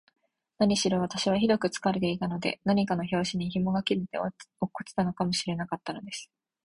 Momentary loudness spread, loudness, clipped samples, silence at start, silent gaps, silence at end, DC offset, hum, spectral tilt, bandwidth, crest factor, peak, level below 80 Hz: 11 LU; -29 LUFS; under 0.1%; 0.6 s; none; 0.4 s; under 0.1%; none; -5 dB/octave; 11.5 kHz; 18 dB; -12 dBFS; -60 dBFS